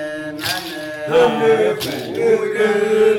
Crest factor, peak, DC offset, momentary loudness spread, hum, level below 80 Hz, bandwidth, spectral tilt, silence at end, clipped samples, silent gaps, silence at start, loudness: 12 dB; -6 dBFS; under 0.1%; 10 LU; none; -56 dBFS; 18 kHz; -4.5 dB/octave; 0 s; under 0.1%; none; 0 s; -17 LUFS